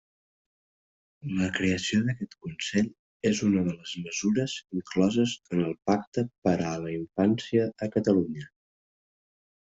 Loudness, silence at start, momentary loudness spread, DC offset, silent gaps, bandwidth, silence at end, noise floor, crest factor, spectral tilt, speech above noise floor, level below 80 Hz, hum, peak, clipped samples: -28 LUFS; 1.25 s; 10 LU; under 0.1%; 2.99-3.20 s, 6.07-6.12 s, 6.38-6.42 s; 8 kHz; 1.15 s; under -90 dBFS; 18 dB; -5.5 dB/octave; over 63 dB; -64 dBFS; none; -10 dBFS; under 0.1%